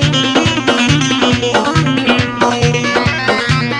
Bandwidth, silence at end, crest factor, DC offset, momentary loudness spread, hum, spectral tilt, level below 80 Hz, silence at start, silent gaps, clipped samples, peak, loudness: 11 kHz; 0 s; 12 dB; under 0.1%; 2 LU; none; -4.5 dB/octave; -36 dBFS; 0 s; none; under 0.1%; 0 dBFS; -12 LUFS